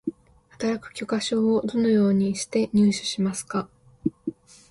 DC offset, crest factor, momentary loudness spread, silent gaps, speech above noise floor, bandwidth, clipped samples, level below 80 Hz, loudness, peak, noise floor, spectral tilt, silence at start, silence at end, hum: under 0.1%; 16 dB; 11 LU; none; 31 dB; 11.5 kHz; under 0.1%; -60 dBFS; -24 LUFS; -10 dBFS; -54 dBFS; -5.5 dB/octave; 0.05 s; 0.4 s; none